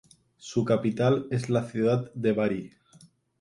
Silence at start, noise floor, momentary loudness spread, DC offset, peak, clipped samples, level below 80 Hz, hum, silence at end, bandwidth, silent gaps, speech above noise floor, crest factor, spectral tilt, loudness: 0.45 s; -57 dBFS; 9 LU; under 0.1%; -12 dBFS; under 0.1%; -64 dBFS; none; 0.75 s; 11.5 kHz; none; 32 dB; 16 dB; -7.5 dB/octave; -27 LUFS